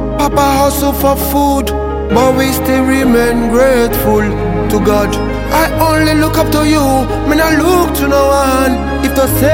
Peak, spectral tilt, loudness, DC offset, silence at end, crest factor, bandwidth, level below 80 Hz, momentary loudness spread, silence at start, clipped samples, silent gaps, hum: 0 dBFS; -5.5 dB/octave; -11 LUFS; under 0.1%; 0 s; 10 dB; 17 kHz; -22 dBFS; 4 LU; 0 s; under 0.1%; none; none